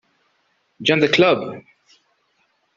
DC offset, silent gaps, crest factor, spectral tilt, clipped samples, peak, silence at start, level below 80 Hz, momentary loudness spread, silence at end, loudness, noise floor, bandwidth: under 0.1%; none; 20 dB; -3 dB/octave; under 0.1%; -2 dBFS; 0.8 s; -62 dBFS; 18 LU; 1.15 s; -17 LUFS; -66 dBFS; 7.6 kHz